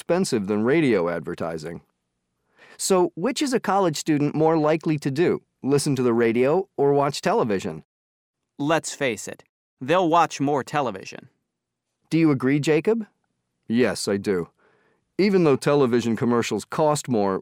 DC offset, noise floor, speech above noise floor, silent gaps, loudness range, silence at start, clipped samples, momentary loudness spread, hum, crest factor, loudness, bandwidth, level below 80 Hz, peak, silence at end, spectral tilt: under 0.1%; -81 dBFS; 60 dB; 7.85-8.34 s, 9.49-9.77 s; 3 LU; 0.1 s; under 0.1%; 11 LU; none; 18 dB; -22 LUFS; 17 kHz; -64 dBFS; -6 dBFS; 0 s; -5.5 dB/octave